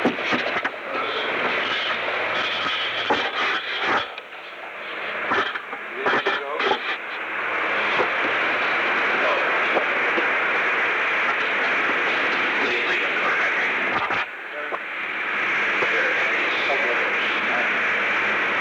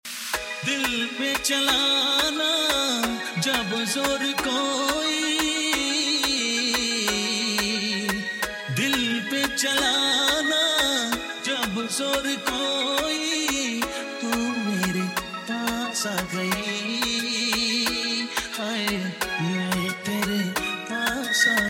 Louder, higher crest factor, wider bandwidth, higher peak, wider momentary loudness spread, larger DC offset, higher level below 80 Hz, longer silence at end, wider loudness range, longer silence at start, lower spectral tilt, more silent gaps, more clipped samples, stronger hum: about the same, -21 LUFS vs -23 LUFS; about the same, 16 dB vs 18 dB; first, 19.5 kHz vs 17 kHz; about the same, -8 dBFS vs -8 dBFS; about the same, 7 LU vs 7 LU; neither; second, -68 dBFS vs -52 dBFS; about the same, 0 s vs 0 s; about the same, 4 LU vs 4 LU; about the same, 0 s vs 0.05 s; about the same, -3 dB/octave vs -2 dB/octave; neither; neither; neither